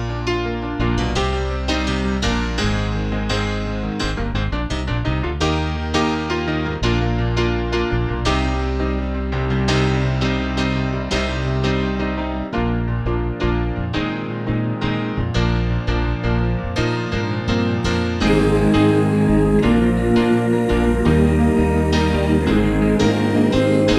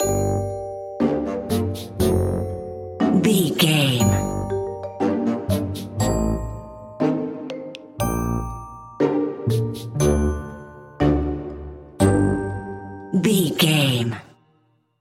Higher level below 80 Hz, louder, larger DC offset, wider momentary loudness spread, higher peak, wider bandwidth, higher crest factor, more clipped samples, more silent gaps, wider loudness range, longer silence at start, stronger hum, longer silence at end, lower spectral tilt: first, -26 dBFS vs -36 dBFS; first, -19 LUFS vs -22 LUFS; neither; second, 7 LU vs 16 LU; about the same, -4 dBFS vs -4 dBFS; second, 12.5 kHz vs 16.5 kHz; about the same, 14 dB vs 18 dB; neither; neither; about the same, 5 LU vs 5 LU; about the same, 0 s vs 0 s; neither; second, 0 s vs 0.75 s; about the same, -6.5 dB/octave vs -5.5 dB/octave